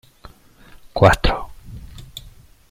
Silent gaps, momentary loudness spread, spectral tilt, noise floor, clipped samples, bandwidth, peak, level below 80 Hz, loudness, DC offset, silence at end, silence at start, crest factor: none; 25 LU; -5.5 dB/octave; -46 dBFS; under 0.1%; 16 kHz; 0 dBFS; -32 dBFS; -17 LUFS; under 0.1%; 0.45 s; 0.95 s; 22 dB